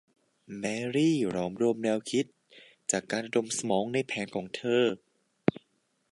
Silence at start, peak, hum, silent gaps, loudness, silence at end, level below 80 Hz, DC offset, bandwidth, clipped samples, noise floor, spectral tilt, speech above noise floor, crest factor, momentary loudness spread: 0.5 s; -6 dBFS; none; none; -30 LUFS; 0.55 s; -70 dBFS; under 0.1%; 11.5 kHz; under 0.1%; -73 dBFS; -4.5 dB/octave; 44 dB; 24 dB; 9 LU